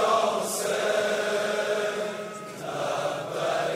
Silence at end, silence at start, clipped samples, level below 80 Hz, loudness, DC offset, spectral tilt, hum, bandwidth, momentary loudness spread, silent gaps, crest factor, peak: 0 s; 0 s; under 0.1%; -74 dBFS; -27 LUFS; under 0.1%; -2.5 dB/octave; none; 16 kHz; 9 LU; none; 16 dB; -12 dBFS